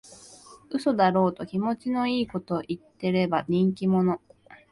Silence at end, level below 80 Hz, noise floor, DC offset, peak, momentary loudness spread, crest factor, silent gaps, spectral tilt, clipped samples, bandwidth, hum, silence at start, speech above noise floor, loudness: 0.15 s; -62 dBFS; -50 dBFS; under 0.1%; -10 dBFS; 9 LU; 16 dB; none; -7.5 dB/octave; under 0.1%; 11.5 kHz; none; 0.1 s; 25 dB; -26 LUFS